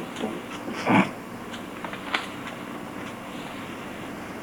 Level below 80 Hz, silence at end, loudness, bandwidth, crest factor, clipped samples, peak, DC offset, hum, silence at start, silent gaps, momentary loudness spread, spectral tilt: -60 dBFS; 0 s; -30 LUFS; over 20 kHz; 24 dB; under 0.1%; -6 dBFS; under 0.1%; none; 0 s; none; 14 LU; -5 dB/octave